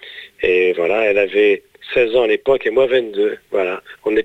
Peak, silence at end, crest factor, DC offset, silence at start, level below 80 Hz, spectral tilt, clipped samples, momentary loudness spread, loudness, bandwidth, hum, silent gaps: -4 dBFS; 0 s; 14 dB; under 0.1%; 0 s; -52 dBFS; -5.5 dB/octave; under 0.1%; 7 LU; -17 LUFS; 7.8 kHz; none; none